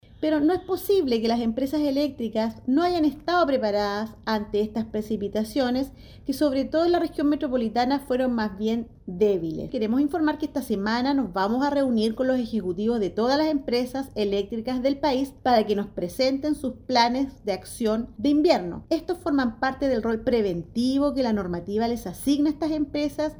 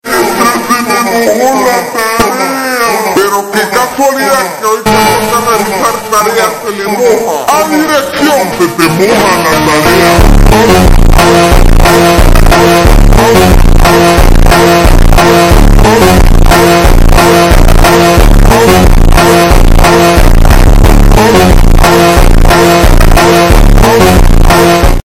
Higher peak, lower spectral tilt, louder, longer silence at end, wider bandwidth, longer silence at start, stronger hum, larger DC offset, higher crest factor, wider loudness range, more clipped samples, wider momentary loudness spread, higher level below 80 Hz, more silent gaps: second, -6 dBFS vs 0 dBFS; about the same, -5.5 dB/octave vs -5 dB/octave; second, -25 LUFS vs -6 LUFS; about the same, 0 s vs 0.1 s; first, over 20 kHz vs 16.5 kHz; first, 0.2 s vs 0.05 s; neither; neither; first, 18 dB vs 4 dB; second, 1 LU vs 4 LU; second, under 0.1% vs 4%; about the same, 6 LU vs 5 LU; second, -50 dBFS vs -8 dBFS; neither